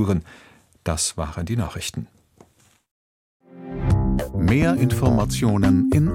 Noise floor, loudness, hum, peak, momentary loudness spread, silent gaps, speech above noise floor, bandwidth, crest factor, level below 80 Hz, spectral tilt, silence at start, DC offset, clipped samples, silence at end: -57 dBFS; -21 LUFS; none; -4 dBFS; 14 LU; 2.91-3.40 s; 37 dB; 16.5 kHz; 16 dB; -34 dBFS; -6 dB/octave; 0 s; under 0.1%; under 0.1%; 0 s